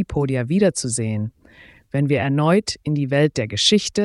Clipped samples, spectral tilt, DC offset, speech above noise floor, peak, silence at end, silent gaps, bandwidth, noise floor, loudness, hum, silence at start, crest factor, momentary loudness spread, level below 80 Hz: under 0.1%; -5 dB/octave; under 0.1%; 29 dB; -4 dBFS; 0 s; none; 12 kHz; -48 dBFS; -20 LUFS; none; 0 s; 16 dB; 8 LU; -46 dBFS